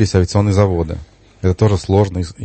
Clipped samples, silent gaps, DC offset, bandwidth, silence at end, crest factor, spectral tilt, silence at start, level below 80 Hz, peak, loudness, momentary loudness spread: under 0.1%; none; under 0.1%; 8.8 kHz; 0 s; 16 dB; -7 dB/octave; 0 s; -34 dBFS; 0 dBFS; -16 LUFS; 8 LU